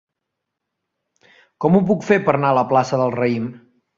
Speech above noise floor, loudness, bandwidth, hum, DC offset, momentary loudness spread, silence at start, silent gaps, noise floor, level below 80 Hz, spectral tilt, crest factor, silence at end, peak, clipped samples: 63 dB; -18 LUFS; 7.6 kHz; none; under 0.1%; 7 LU; 1.6 s; none; -80 dBFS; -60 dBFS; -7.5 dB/octave; 18 dB; 0.4 s; -2 dBFS; under 0.1%